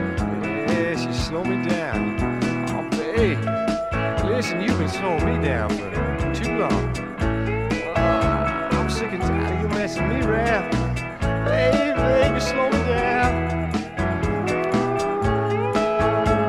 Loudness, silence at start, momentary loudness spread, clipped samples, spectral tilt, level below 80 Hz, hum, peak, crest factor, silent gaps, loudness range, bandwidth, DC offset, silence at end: -22 LUFS; 0 s; 5 LU; under 0.1%; -6.5 dB/octave; -34 dBFS; none; -6 dBFS; 16 dB; none; 2 LU; 14 kHz; under 0.1%; 0 s